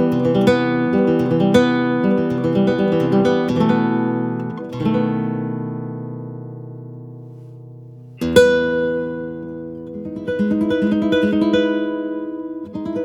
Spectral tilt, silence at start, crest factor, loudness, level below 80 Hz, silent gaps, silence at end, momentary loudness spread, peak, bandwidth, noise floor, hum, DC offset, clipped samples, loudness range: -7 dB/octave; 0 s; 18 dB; -18 LUFS; -50 dBFS; none; 0 s; 18 LU; 0 dBFS; 16 kHz; -38 dBFS; none; under 0.1%; under 0.1%; 8 LU